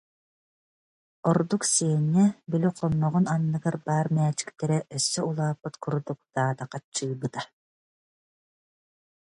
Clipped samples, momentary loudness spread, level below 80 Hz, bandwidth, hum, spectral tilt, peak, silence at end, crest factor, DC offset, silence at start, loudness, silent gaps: under 0.1%; 10 LU; -64 dBFS; 11.5 kHz; none; -5.5 dB/octave; -10 dBFS; 1.9 s; 18 dB; under 0.1%; 1.25 s; -26 LUFS; 6.84-6.92 s